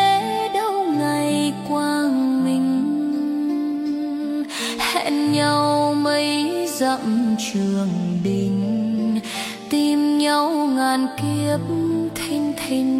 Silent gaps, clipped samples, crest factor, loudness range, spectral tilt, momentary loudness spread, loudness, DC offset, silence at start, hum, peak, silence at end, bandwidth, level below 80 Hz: none; under 0.1%; 16 dB; 2 LU; -5 dB/octave; 6 LU; -21 LUFS; under 0.1%; 0 s; none; -4 dBFS; 0 s; 16 kHz; -58 dBFS